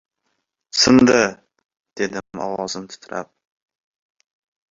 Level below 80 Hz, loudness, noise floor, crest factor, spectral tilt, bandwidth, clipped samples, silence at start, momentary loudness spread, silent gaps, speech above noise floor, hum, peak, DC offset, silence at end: -54 dBFS; -18 LUFS; -74 dBFS; 20 dB; -3.5 dB/octave; 7.8 kHz; under 0.1%; 0.75 s; 19 LU; 1.65-1.69 s, 1.80-1.84 s; 56 dB; none; -2 dBFS; under 0.1%; 1.45 s